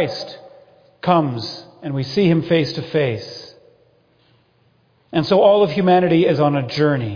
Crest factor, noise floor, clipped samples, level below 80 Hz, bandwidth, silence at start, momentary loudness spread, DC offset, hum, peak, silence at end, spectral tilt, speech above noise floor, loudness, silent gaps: 18 dB; -58 dBFS; under 0.1%; -56 dBFS; 5.4 kHz; 0 s; 16 LU; under 0.1%; none; -2 dBFS; 0 s; -7.5 dB/octave; 42 dB; -17 LUFS; none